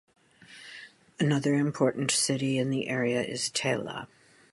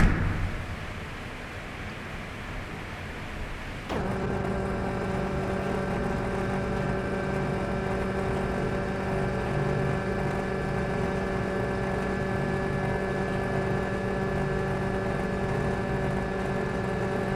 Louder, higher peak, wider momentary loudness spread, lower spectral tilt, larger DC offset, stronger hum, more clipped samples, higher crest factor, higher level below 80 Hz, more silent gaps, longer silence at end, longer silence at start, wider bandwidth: about the same, -28 LUFS vs -30 LUFS; about the same, -10 dBFS vs -10 dBFS; first, 20 LU vs 8 LU; second, -4 dB/octave vs -7 dB/octave; neither; neither; neither; about the same, 18 dB vs 20 dB; second, -70 dBFS vs -38 dBFS; neither; first, 0.5 s vs 0 s; first, 0.5 s vs 0 s; second, 11.5 kHz vs 13.5 kHz